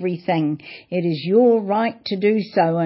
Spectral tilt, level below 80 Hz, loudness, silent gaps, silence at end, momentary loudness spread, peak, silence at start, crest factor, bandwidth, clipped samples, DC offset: -11.5 dB/octave; -68 dBFS; -20 LUFS; none; 0 s; 9 LU; -6 dBFS; 0 s; 14 dB; 5.8 kHz; under 0.1%; under 0.1%